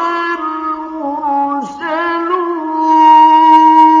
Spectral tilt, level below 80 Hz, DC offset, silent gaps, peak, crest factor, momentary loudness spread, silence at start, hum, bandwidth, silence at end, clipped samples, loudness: -4 dB/octave; -58 dBFS; under 0.1%; none; 0 dBFS; 10 dB; 14 LU; 0 s; none; 7.2 kHz; 0 s; 0.3%; -11 LUFS